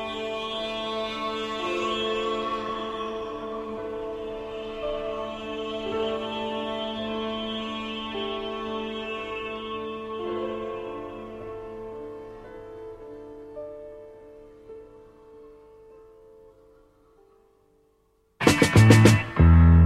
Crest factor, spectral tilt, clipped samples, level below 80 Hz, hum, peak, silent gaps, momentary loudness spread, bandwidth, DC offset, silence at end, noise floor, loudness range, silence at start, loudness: 24 dB; -6 dB/octave; under 0.1%; -36 dBFS; none; -2 dBFS; none; 23 LU; 14 kHz; under 0.1%; 0 s; -66 dBFS; 21 LU; 0 s; -26 LUFS